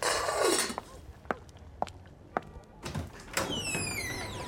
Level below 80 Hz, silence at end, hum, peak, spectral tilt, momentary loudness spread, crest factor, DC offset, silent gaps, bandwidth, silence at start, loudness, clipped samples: -52 dBFS; 0 s; none; -12 dBFS; -2.5 dB/octave; 22 LU; 22 dB; under 0.1%; none; 18 kHz; 0 s; -33 LUFS; under 0.1%